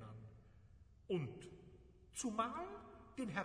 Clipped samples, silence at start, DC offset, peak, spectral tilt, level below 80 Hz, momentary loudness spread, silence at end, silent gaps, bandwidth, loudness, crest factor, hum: under 0.1%; 0 s; under 0.1%; -26 dBFS; -5 dB/octave; -68 dBFS; 24 LU; 0 s; none; 11 kHz; -46 LUFS; 22 dB; none